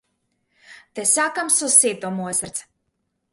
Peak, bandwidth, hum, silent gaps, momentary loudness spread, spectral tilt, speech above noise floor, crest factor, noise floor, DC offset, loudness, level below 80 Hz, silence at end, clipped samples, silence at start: 0 dBFS; 12 kHz; none; none; 17 LU; -1.5 dB/octave; 53 dB; 22 dB; -74 dBFS; under 0.1%; -18 LUFS; -66 dBFS; 0.7 s; under 0.1%; 0.7 s